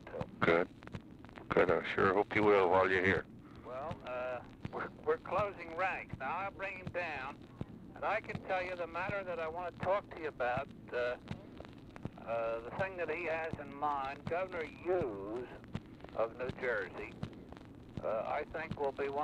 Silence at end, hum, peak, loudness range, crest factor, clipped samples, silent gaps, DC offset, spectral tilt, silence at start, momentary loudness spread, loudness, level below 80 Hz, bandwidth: 0 s; none; -16 dBFS; 8 LU; 20 dB; under 0.1%; none; under 0.1%; -7 dB/octave; 0 s; 17 LU; -36 LUFS; -62 dBFS; 10 kHz